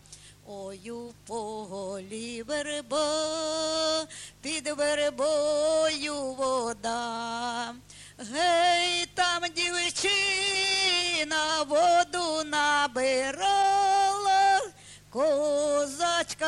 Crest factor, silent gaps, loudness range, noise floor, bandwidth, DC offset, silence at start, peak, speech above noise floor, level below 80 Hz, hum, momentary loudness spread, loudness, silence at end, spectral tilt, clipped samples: 16 dB; none; 6 LU; -47 dBFS; 12.5 kHz; under 0.1%; 0.1 s; -12 dBFS; 19 dB; -62 dBFS; 50 Hz at -70 dBFS; 14 LU; -26 LUFS; 0 s; -1 dB/octave; under 0.1%